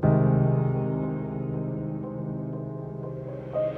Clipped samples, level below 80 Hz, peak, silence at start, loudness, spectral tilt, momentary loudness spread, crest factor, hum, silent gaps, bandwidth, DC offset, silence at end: under 0.1%; -48 dBFS; -10 dBFS; 0 s; -28 LUFS; -12.5 dB/octave; 13 LU; 18 dB; none; none; 3.3 kHz; under 0.1%; 0 s